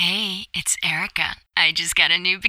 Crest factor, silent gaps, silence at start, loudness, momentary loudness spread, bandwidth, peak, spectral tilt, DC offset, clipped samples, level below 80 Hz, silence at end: 20 dB; none; 0 s; -19 LUFS; 8 LU; 16.5 kHz; -2 dBFS; -0.5 dB/octave; under 0.1%; under 0.1%; -52 dBFS; 0 s